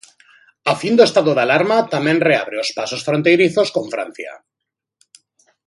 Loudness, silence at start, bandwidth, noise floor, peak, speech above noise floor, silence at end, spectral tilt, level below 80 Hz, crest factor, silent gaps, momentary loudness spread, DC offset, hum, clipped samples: -16 LUFS; 0.65 s; 11.5 kHz; -82 dBFS; 0 dBFS; 66 dB; 1.3 s; -5 dB/octave; -66 dBFS; 18 dB; none; 13 LU; under 0.1%; none; under 0.1%